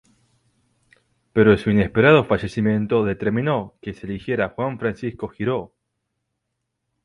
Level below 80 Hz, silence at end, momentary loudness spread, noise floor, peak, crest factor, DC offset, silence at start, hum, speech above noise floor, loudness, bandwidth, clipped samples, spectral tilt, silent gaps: -48 dBFS; 1.4 s; 14 LU; -78 dBFS; -2 dBFS; 20 dB; under 0.1%; 1.35 s; none; 58 dB; -20 LUFS; 11 kHz; under 0.1%; -8 dB/octave; none